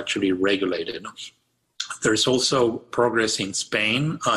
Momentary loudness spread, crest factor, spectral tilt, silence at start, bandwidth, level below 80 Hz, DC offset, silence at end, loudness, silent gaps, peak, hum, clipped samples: 14 LU; 16 dB; -3.5 dB/octave; 0 s; 13 kHz; -58 dBFS; under 0.1%; 0 s; -22 LUFS; none; -8 dBFS; none; under 0.1%